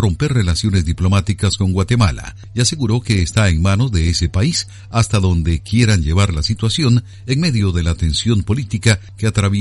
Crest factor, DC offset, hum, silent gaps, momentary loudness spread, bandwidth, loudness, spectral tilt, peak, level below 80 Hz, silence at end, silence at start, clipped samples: 16 dB; under 0.1%; none; none; 4 LU; 11.5 kHz; -16 LUFS; -5 dB/octave; 0 dBFS; -28 dBFS; 0 s; 0 s; under 0.1%